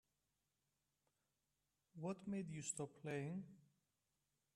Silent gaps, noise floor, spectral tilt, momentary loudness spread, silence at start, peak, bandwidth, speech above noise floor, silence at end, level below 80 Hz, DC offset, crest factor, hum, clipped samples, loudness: none; -90 dBFS; -5.5 dB/octave; 8 LU; 1.95 s; -32 dBFS; 12 kHz; 41 dB; 0.95 s; -86 dBFS; under 0.1%; 22 dB; none; under 0.1%; -49 LUFS